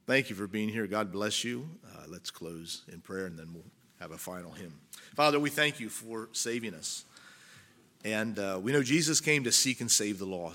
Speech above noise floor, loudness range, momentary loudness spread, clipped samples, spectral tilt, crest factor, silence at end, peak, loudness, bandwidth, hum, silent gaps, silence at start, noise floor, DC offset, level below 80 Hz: 27 dB; 13 LU; 21 LU; under 0.1%; -2.5 dB/octave; 24 dB; 0 s; -10 dBFS; -30 LUFS; 17.5 kHz; none; none; 0.1 s; -59 dBFS; under 0.1%; -74 dBFS